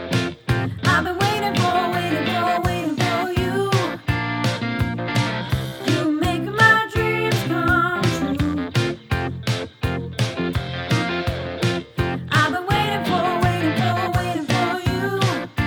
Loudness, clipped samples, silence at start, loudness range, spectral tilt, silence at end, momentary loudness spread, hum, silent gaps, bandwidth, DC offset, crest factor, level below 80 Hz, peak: -21 LUFS; under 0.1%; 0 s; 4 LU; -5.5 dB/octave; 0 s; 6 LU; none; none; 18.5 kHz; under 0.1%; 18 dB; -38 dBFS; -2 dBFS